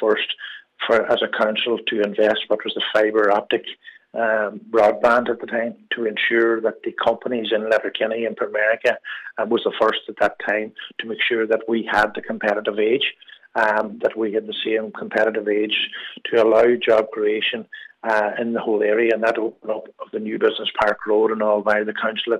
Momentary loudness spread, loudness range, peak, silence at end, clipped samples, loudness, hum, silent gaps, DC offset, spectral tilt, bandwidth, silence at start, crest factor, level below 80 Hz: 9 LU; 2 LU; -6 dBFS; 0 s; under 0.1%; -20 LUFS; none; none; under 0.1%; -5 dB/octave; 9.2 kHz; 0 s; 14 dB; -64 dBFS